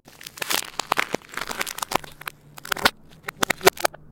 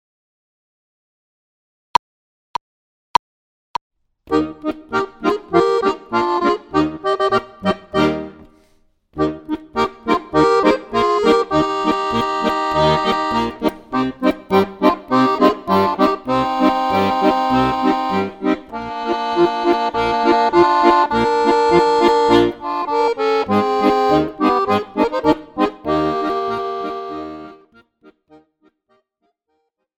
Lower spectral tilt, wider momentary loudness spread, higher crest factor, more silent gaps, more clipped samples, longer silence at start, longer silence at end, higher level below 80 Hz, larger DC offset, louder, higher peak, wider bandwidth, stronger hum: second, -1.5 dB/octave vs -6 dB/octave; first, 18 LU vs 10 LU; first, 26 dB vs 18 dB; neither; neither; second, 0.25 s vs 4.3 s; second, 0.25 s vs 2.45 s; second, -54 dBFS vs -46 dBFS; neither; second, -24 LUFS vs -17 LUFS; about the same, 0 dBFS vs 0 dBFS; about the same, 17 kHz vs 17 kHz; neither